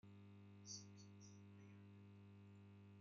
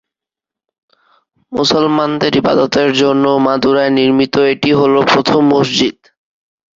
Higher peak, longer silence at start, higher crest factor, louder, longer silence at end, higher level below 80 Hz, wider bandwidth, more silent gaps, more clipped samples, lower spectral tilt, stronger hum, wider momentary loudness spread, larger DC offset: second, -42 dBFS vs 0 dBFS; second, 0.05 s vs 1.5 s; first, 20 dB vs 12 dB; second, -62 LUFS vs -12 LUFS; second, 0 s vs 0.85 s; second, under -90 dBFS vs -50 dBFS; about the same, 7.4 kHz vs 7.6 kHz; neither; neither; about the same, -5.5 dB/octave vs -5 dB/octave; first, 50 Hz at -65 dBFS vs none; first, 8 LU vs 3 LU; neither